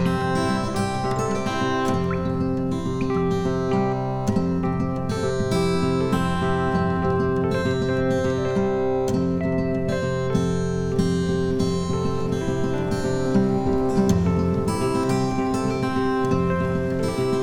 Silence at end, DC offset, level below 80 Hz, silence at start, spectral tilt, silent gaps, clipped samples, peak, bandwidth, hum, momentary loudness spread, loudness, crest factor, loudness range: 0 s; under 0.1%; -40 dBFS; 0 s; -7 dB/octave; none; under 0.1%; -8 dBFS; 13.5 kHz; none; 3 LU; -23 LUFS; 14 dB; 2 LU